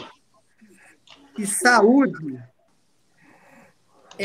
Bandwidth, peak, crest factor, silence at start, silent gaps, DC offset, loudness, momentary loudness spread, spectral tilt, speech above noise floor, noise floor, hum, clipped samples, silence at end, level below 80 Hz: 16 kHz; -2 dBFS; 22 dB; 0 s; none; under 0.1%; -18 LUFS; 23 LU; -3.5 dB/octave; 48 dB; -66 dBFS; none; under 0.1%; 0 s; -72 dBFS